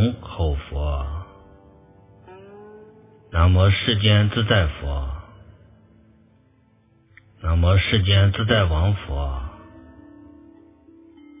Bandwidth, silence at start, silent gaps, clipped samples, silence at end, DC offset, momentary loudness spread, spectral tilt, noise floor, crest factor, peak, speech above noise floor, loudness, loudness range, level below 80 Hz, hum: 3.8 kHz; 0 s; none; under 0.1%; 1.75 s; under 0.1%; 16 LU; -10 dB/octave; -58 dBFS; 20 dB; -2 dBFS; 40 dB; -20 LUFS; 7 LU; -30 dBFS; none